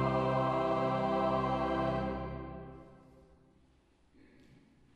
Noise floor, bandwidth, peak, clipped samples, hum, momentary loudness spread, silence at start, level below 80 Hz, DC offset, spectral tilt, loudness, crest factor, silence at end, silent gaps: -67 dBFS; 9.8 kHz; -18 dBFS; under 0.1%; none; 16 LU; 0 s; -52 dBFS; under 0.1%; -8 dB/octave; -33 LUFS; 16 dB; 2 s; none